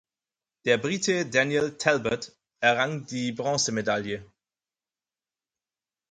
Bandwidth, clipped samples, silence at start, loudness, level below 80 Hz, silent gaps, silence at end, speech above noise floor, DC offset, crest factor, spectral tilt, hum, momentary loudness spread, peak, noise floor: 9.6 kHz; under 0.1%; 0.65 s; -26 LUFS; -64 dBFS; none; 1.85 s; over 64 dB; under 0.1%; 24 dB; -3.5 dB/octave; none; 9 LU; -6 dBFS; under -90 dBFS